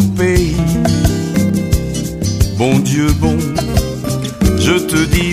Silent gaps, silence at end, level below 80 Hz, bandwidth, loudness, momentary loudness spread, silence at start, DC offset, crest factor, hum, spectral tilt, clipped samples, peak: none; 0 s; -22 dBFS; 15.5 kHz; -14 LUFS; 6 LU; 0 s; under 0.1%; 14 dB; none; -5.5 dB/octave; under 0.1%; 0 dBFS